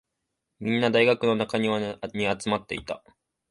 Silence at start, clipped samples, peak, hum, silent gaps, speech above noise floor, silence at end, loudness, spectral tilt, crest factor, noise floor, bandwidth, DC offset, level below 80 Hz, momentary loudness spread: 0.6 s; under 0.1%; -6 dBFS; none; none; 56 dB; 0.55 s; -25 LUFS; -5.5 dB/octave; 20 dB; -81 dBFS; 11.5 kHz; under 0.1%; -60 dBFS; 13 LU